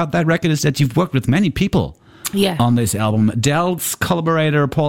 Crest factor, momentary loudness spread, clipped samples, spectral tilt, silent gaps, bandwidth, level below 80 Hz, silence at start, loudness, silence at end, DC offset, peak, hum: 14 dB; 4 LU; under 0.1%; -5.5 dB/octave; none; 17 kHz; -40 dBFS; 0 s; -17 LUFS; 0 s; under 0.1%; -2 dBFS; none